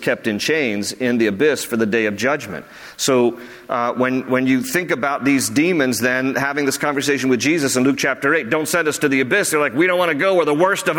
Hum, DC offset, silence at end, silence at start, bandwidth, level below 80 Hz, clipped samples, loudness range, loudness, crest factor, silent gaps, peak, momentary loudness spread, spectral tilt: none; under 0.1%; 0 s; 0 s; 17.5 kHz; -60 dBFS; under 0.1%; 3 LU; -18 LUFS; 14 dB; none; -4 dBFS; 5 LU; -4 dB/octave